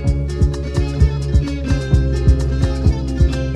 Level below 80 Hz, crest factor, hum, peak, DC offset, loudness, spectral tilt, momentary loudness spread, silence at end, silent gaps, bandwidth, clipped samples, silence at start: -18 dBFS; 14 dB; none; -2 dBFS; under 0.1%; -18 LUFS; -7.5 dB/octave; 4 LU; 0 s; none; 9.6 kHz; under 0.1%; 0 s